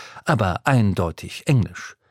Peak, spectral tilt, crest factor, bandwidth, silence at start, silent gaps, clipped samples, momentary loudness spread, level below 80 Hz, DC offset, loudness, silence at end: 0 dBFS; -6.5 dB/octave; 20 dB; 15.5 kHz; 0 s; none; under 0.1%; 10 LU; -44 dBFS; under 0.1%; -21 LUFS; 0.2 s